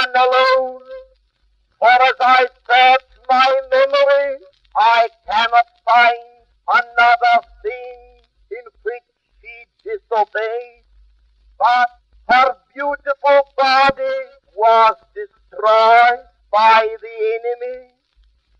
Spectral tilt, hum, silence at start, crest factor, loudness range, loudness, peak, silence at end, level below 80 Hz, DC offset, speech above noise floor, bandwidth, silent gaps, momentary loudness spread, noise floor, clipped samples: -2.5 dB/octave; none; 0 s; 16 dB; 9 LU; -14 LUFS; 0 dBFS; 0.8 s; -56 dBFS; under 0.1%; 47 dB; 7.6 kHz; none; 18 LU; -61 dBFS; under 0.1%